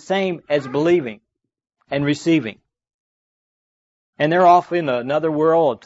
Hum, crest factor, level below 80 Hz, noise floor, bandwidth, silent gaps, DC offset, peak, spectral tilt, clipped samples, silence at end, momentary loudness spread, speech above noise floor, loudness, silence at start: none; 16 dB; -64 dBFS; under -90 dBFS; 8 kHz; 2.94-4.13 s; under 0.1%; -4 dBFS; -6.5 dB/octave; under 0.1%; 0.1 s; 9 LU; over 72 dB; -18 LUFS; 0.1 s